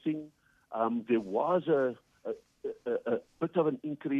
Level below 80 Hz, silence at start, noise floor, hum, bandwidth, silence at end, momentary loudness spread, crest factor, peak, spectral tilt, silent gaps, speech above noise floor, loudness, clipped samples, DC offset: -76 dBFS; 0.05 s; -56 dBFS; none; 7.2 kHz; 0 s; 12 LU; 16 dB; -16 dBFS; -8.5 dB/octave; none; 25 dB; -32 LUFS; under 0.1%; under 0.1%